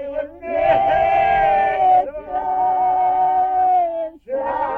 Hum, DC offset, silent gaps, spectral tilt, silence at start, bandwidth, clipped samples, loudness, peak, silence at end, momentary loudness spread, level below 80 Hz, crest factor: none; under 0.1%; none; -6.5 dB/octave; 0 s; 4.4 kHz; under 0.1%; -18 LUFS; -6 dBFS; 0 s; 10 LU; -46 dBFS; 12 dB